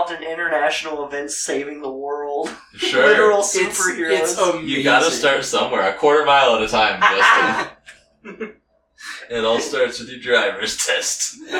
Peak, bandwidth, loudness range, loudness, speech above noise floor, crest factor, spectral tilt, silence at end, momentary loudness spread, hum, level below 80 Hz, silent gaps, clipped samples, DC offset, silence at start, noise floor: -2 dBFS; 18.5 kHz; 6 LU; -17 LUFS; 29 dB; 18 dB; -1.5 dB/octave; 0 s; 15 LU; none; -56 dBFS; none; under 0.1%; under 0.1%; 0 s; -47 dBFS